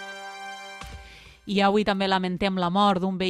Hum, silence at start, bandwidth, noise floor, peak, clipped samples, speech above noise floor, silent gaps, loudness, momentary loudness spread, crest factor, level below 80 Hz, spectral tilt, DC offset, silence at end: none; 0 s; 11 kHz; -47 dBFS; -10 dBFS; under 0.1%; 24 dB; none; -23 LUFS; 19 LU; 16 dB; -52 dBFS; -6 dB/octave; under 0.1%; 0 s